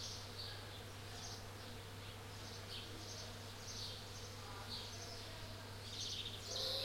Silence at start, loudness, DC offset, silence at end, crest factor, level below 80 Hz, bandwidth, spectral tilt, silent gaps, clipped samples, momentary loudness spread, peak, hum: 0 s; -48 LUFS; under 0.1%; 0 s; 18 dB; -62 dBFS; 16.5 kHz; -3 dB/octave; none; under 0.1%; 8 LU; -30 dBFS; none